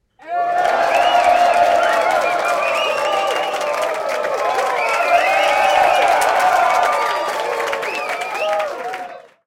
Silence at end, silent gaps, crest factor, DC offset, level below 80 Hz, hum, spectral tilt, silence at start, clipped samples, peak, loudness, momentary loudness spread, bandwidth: 0.25 s; none; 16 dB; under 0.1%; -58 dBFS; none; -1 dB/octave; 0.2 s; under 0.1%; -2 dBFS; -16 LUFS; 8 LU; 17 kHz